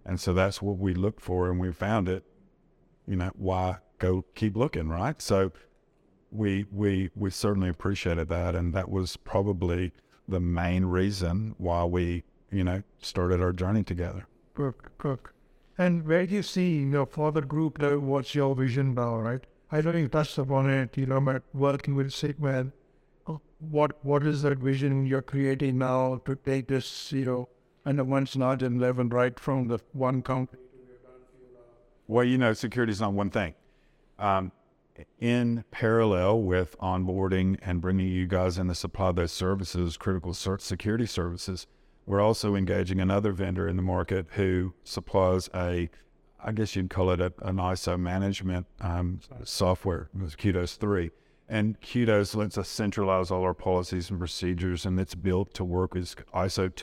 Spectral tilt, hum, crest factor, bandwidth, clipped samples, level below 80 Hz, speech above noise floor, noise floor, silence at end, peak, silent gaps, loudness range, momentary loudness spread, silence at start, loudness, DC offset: -6.5 dB/octave; none; 18 dB; 13.5 kHz; under 0.1%; -48 dBFS; 37 dB; -65 dBFS; 0 s; -10 dBFS; none; 3 LU; 8 LU; 0.05 s; -28 LUFS; under 0.1%